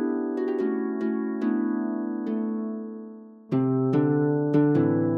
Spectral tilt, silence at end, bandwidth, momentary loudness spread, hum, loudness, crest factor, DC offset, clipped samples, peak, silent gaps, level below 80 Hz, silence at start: -11 dB/octave; 0 s; 5 kHz; 12 LU; none; -25 LUFS; 14 dB; under 0.1%; under 0.1%; -10 dBFS; none; -72 dBFS; 0 s